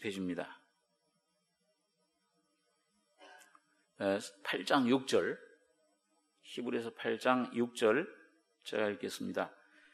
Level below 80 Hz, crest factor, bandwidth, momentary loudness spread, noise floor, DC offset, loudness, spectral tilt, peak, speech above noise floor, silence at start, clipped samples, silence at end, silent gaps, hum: -86 dBFS; 24 dB; 13 kHz; 13 LU; -80 dBFS; under 0.1%; -35 LUFS; -4.5 dB/octave; -14 dBFS; 46 dB; 0 s; under 0.1%; 0.45 s; none; none